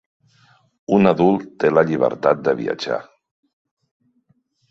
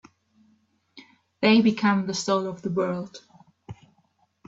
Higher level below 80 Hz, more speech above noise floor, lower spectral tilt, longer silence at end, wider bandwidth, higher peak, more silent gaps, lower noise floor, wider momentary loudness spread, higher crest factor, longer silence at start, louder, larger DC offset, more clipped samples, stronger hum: first, -58 dBFS vs -66 dBFS; about the same, 47 dB vs 45 dB; first, -7.5 dB/octave vs -5 dB/octave; first, 1.7 s vs 0.75 s; about the same, 7.6 kHz vs 7.8 kHz; first, -2 dBFS vs -8 dBFS; neither; about the same, -64 dBFS vs -67 dBFS; second, 10 LU vs 26 LU; about the same, 18 dB vs 20 dB; about the same, 0.9 s vs 0.95 s; first, -18 LUFS vs -23 LUFS; neither; neither; neither